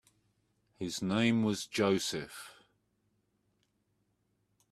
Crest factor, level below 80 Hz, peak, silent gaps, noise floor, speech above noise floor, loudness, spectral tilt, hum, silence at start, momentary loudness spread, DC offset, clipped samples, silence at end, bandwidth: 20 dB; -72 dBFS; -16 dBFS; none; -77 dBFS; 46 dB; -32 LUFS; -4.5 dB/octave; 50 Hz at -60 dBFS; 0.8 s; 17 LU; under 0.1%; under 0.1%; 2.2 s; 14.5 kHz